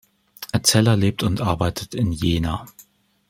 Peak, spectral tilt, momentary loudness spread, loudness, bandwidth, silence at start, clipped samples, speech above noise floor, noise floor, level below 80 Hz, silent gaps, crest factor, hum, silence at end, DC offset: 0 dBFS; -4.5 dB/octave; 11 LU; -21 LUFS; 16.5 kHz; 0.4 s; under 0.1%; 21 dB; -41 dBFS; -42 dBFS; none; 20 dB; none; 0.6 s; under 0.1%